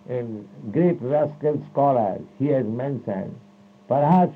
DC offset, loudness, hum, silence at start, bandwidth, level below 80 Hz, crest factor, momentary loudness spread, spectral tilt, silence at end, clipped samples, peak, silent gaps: under 0.1%; -23 LUFS; none; 0.1 s; 4.7 kHz; -70 dBFS; 16 dB; 11 LU; -11 dB/octave; 0 s; under 0.1%; -6 dBFS; none